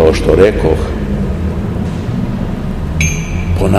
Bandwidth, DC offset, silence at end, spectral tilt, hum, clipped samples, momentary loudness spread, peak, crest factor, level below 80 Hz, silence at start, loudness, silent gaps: 13 kHz; 0.9%; 0 s; -6.5 dB/octave; none; 0.6%; 9 LU; 0 dBFS; 12 dB; -20 dBFS; 0 s; -15 LUFS; none